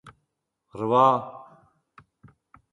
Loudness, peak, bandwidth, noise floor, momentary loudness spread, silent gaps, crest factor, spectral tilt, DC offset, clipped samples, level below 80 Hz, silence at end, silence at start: -22 LUFS; -6 dBFS; 11 kHz; -79 dBFS; 26 LU; none; 22 dB; -7.5 dB/octave; under 0.1%; under 0.1%; -70 dBFS; 1.3 s; 0.05 s